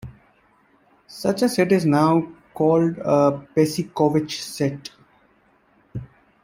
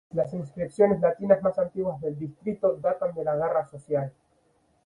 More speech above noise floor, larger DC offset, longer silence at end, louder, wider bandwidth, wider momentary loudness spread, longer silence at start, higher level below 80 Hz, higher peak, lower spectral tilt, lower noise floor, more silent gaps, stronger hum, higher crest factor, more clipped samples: about the same, 40 dB vs 41 dB; neither; second, 0.4 s vs 0.75 s; first, -20 LUFS vs -27 LUFS; first, 16 kHz vs 10.5 kHz; first, 19 LU vs 11 LU; about the same, 0.05 s vs 0.15 s; about the same, -58 dBFS vs -62 dBFS; about the same, -4 dBFS vs -6 dBFS; second, -6.5 dB/octave vs -9.5 dB/octave; second, -60 dBFS vs -67 dBFS; neither; neither; about the same, 18 dB vs 20 dB; neither